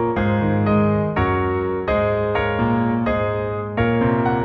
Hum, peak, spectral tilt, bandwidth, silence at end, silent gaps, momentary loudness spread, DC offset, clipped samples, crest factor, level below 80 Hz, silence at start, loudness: none; -6 dBFS; -10 dB/octave; 4.9 kHz; 0 s; none; 4 LU; under 0.1%; under 0.1%; 12 dB; -36 dBFS; 0 s; -20 LUFS